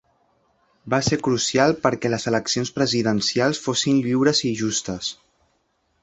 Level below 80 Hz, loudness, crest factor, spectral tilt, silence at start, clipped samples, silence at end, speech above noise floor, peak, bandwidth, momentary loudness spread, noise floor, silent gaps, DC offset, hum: -54 dBFS; -21 LUFS; 20 dB; -4 dB/octave; 0.85 s; under 0.1%; 0.9 s; 47 dB; -2 dBFS; 8.2 kHz; 6 LU; -68 dBFS; none; under 0.1%; none